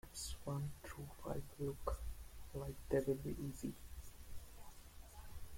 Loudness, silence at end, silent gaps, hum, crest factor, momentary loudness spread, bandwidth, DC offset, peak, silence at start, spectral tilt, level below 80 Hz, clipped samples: -46 LUFS; 0 s; none; none; 20 dB; 18 LU; 16.5 kHz; under 0.1%; -24 dBFS; 0.05 s; -6 dB/octave; -54 dBFS; under 0.1%